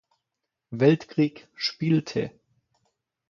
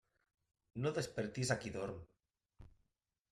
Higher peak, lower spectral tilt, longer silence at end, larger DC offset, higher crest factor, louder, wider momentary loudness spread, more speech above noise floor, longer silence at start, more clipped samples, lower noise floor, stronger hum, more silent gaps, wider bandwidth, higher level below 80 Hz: first, -6 dBFS vs -22 dBFS; first, -7 dB/octave vs -5 dB/octave; first, 1 s vs 0.6 s; neither; about the same, 20 dB vs 22 dB; first, -25 LUFS vs -41 LUFS; about the same, 11 LU vs 11 LU; first, 60 dB vs 46 dB; about the same, 0.7 s vs 0.75 s; neither; about the same, -84 dBFS vs -86 dBFS; neither; neither; second, 7.2 kHz vs 13.5 kHz; about the same, -66 dBFS vs -68 dBFS